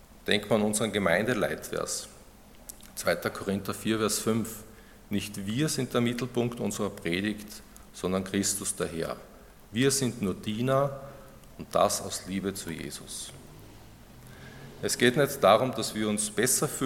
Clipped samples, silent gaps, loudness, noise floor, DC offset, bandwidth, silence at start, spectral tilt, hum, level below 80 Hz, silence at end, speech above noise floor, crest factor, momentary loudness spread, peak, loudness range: under 0.1%; none; -29 LUFS; -52 dBFS; under 0.1%; 17.5 kHz; 0 s; -4 dB/octave; none; -56 dBFS; 0 s; 23 dB; 24 dB; 18 LU; -6 dBFS; 4 LU